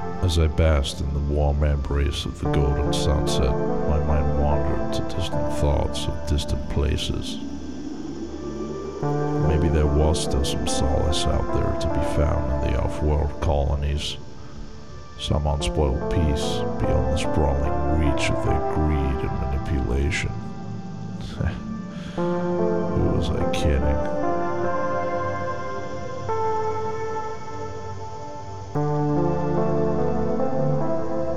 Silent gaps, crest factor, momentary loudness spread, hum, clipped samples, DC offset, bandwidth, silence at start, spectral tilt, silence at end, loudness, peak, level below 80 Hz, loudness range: none; 16 dB; 11 LU; none; under 0.1%; 3%; 12.5 kHz; 0 s; -6 dB/octave; 0 s; -24 LUFS; -8 dBFS; -30 dBFS; 5 LU